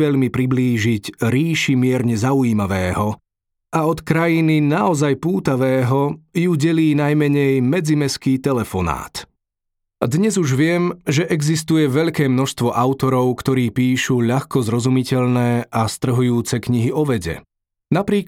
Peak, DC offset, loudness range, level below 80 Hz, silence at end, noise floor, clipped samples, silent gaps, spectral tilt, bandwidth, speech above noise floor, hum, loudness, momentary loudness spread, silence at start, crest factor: -2 dBFS; under 0.1%; 3 LU; -48 dBFS; 0.05 s; -78 dBFS; under 0.1%; none; -6.5 dB/octave; 16.5 kHz; 61 dB; none; -18 LUFS; 5 LU; 0 s; 16 dB